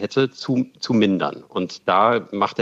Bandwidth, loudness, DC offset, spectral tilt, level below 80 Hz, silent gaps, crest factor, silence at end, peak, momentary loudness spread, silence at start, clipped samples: 7.8 kHz; -21 LUFS; under 0.1%; -6 dB/octave; -70 dBFS; none; 18 dB; 0 s; -4 dBFS; 8 LU; 0 s; under 0.1%